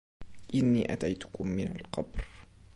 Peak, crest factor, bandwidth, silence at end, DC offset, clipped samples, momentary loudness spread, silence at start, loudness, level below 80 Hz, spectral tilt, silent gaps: -16 dBFS; 16 dB; 11 kHz; 0.3 s; under 0.1%; under 0.1%; 14 LU; 0.2 s; -32 LUFS; -48 dBFS; -7 dB/octave; none